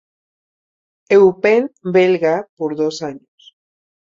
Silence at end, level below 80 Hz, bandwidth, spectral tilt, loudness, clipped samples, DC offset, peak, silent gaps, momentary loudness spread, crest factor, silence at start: 1 s; -62 dBFS; 7.6 kHz; -6 dB/octave; -15 LUFS; under 0.1%; under 0.1%; -2 dBFS; 2.49-2.57 s; 12 LU; 16 dB; 1.1 s